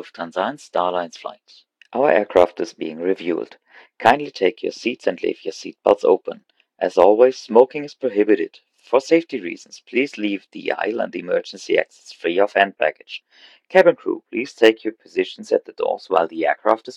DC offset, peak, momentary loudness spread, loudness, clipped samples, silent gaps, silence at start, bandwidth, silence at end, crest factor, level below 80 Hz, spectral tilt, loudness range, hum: under 0.1%; 0 dBFS; 13 LU; -20 LUFS; under 0.1%; none; 0 s; 10 kHz; 0 s; 20 dB; -64 dBFS; -4.5 dB/octave; 4 LU; none